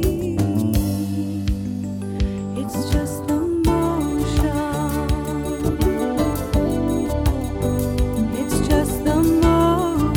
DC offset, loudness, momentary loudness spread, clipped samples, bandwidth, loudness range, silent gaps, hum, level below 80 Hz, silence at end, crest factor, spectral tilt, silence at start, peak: under 0.1%; -21 LUFS; 7 LU; under 0.1%; 17.5 kHz; 3 LU; none; none; -28 dBFS; 0 s; 14 dB; -6.5 dB/octave; 0 s; -4 dBFS